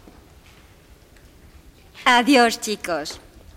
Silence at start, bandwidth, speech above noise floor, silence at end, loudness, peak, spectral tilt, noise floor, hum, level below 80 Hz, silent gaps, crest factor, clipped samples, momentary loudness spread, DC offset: 1.95 s; 16.5 kHz; 31 dB; 0.4 s; -18 LUFS; -2 dBFS; -2.5 dB/octave; -50 dBFS; none; -52 dBFS; none; 22 dB; under 0.1%; 17 LU; under 0.1%